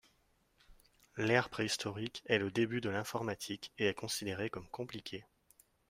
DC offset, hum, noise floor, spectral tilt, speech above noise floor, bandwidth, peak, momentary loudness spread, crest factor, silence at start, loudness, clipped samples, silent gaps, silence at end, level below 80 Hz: under 0.1%; none; -74 dBFS; -4 dB/octave; 37 dB; 16 kHz; -14 dBFS; 12 LU; 24 dB; 0.7 s; -37 LUFS; under 0.1%; none; 0.7 s; -70 dBFS